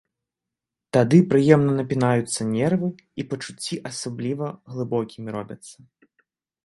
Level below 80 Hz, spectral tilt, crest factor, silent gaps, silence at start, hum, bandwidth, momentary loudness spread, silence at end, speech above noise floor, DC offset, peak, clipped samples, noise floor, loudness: -60 dBFS; -6.5 dB/octave; 22 dB; none; 0.95 s; none; 11.5 kHz; 16 LU; 0.9 s; 65 dB; under 0.1%; 0 dBFS; under 0.1%; -87 dBFS; -22 LUFS